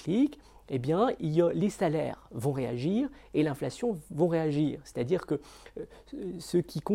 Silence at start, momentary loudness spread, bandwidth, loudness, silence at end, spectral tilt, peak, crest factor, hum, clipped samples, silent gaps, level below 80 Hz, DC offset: 0 s; 12 LU; 16 kHz; -30 LUFS; 0 s; -7.5 dB/octave; -14 dBFS; 16 dB; none; under 0.1%; none; -58 dBFS; under 0.1%